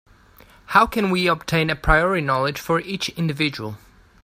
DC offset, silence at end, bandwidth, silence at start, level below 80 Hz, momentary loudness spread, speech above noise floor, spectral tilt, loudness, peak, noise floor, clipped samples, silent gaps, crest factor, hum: under 0.1%; 0.45 s; 16 kHz; 0.7 s; -36 dBFS; 7 LU; 30 dB; -5 dB/octave; -20 LUFS; 0 dBFS; -50 dBFS; under 0.1%; none; 22 dB; none